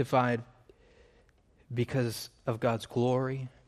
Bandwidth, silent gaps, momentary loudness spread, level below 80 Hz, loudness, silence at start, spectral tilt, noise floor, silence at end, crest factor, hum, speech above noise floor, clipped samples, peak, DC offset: 15 kHz; none; 8 LU; -64 dBFS; -32 LUFS; 0 s; -6.5 dB/octave; -64 dBFS; 0.2 s; 18 dB; none; 34 dB; under 0.1%; -14 dBFS; under 0.1%